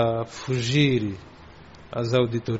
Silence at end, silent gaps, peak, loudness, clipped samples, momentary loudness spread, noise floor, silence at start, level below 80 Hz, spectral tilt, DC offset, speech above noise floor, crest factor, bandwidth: 0 s; none; -8 dBFS; -24 LUFS; under 0.1%; 13 LU; -46 dBFS; 0 s; -52 dBFS; -5.5 dB/octave; 0.1%; 23 dB; 18 dB; 8 kHz